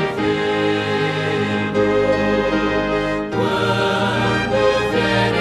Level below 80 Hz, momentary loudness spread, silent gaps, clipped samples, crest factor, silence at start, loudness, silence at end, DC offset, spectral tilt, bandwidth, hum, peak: -40 dBFS; 3 LU; none; under 0.1%; 14 dB; 0 s; -18 LUFS; 0 s; under 0.1%; -6 dB/octave; 12.5 kHz; none; -4 dBFS